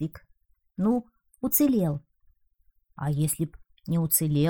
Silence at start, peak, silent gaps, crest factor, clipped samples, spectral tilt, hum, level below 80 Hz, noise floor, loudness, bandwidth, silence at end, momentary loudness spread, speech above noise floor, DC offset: 0 s; -8 dBFS; none; 20 dB; under 0.1%; -6 dB/octave; none; -56 dBFS; -66 dBFS; -27 LUFS; over 20 kHz; 0 s; 14 LU; 41 dB; under 0.1%